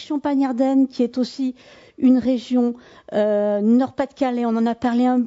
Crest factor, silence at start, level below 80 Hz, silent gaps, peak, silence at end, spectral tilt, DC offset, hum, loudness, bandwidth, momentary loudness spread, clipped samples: 14 dB; 0 s; -60 dBFS; none; -6 dBFS; 0 s; -7 dB/octave; under 0.1%; none; -20 LUFS; 7.8 kHz; 7 LU; under 0.1%